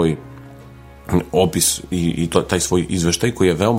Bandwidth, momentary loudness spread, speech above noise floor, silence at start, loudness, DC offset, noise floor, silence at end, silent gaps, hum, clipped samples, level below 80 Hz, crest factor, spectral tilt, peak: 16 kHz; 13 LU; 22 dB; 0 s; -18 LUFS; under 0.1%; -40 dBFS; 0 s; none; none; under 0.1%; -40 dBFS; 18 dB; -4.5 dB/octave; 0 dBFS